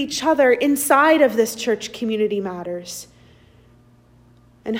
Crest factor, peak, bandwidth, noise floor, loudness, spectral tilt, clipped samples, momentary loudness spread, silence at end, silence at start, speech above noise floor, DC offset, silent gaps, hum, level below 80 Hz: 16 dB; -4 dBFS; 16.5 kHz; -52 dBFS; -18 LUFS; -3.5 dB/octave; under 0.1%; 16 LU; 0 s; 0 s; 33 dB; under 0.1%; none; 60 Hz at -50 dBFS; -60 dBFS